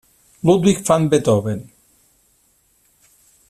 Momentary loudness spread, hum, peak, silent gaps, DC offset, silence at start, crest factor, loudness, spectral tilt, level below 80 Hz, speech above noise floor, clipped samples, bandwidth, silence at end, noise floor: 10 LU; none; -2 dBFS; none; under 0.1%; 0.45 s; 18 dB; -17 LUFS; -6 dB/octave; -52 dBFS; 44 dB; under 0.1%; 14.5 kHz; 1.9 s; -60 dBFS